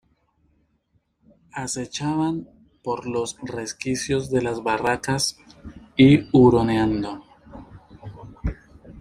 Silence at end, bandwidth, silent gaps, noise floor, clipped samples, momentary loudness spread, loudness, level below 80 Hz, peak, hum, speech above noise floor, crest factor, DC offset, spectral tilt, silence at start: 0 s; 15 kHz; none; -68 dBFS; under 0.1%; 27 LU; -22 LUFS; -44 dBFS; -4 dBFS; none; 47 dB; 20 dB; under 0.1%; -5.5 dB/octave; 1.55 s